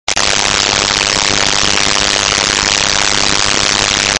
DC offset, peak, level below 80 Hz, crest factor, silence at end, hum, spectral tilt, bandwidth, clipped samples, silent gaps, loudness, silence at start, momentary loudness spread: under 0.1%; 0 dBFS; -32 dBFS; 12 dB; 0 s; none; -0.5 dB/octave; 16 kHz; under 0.1%; none; -10 LUFS; 0.05 s; 0 LU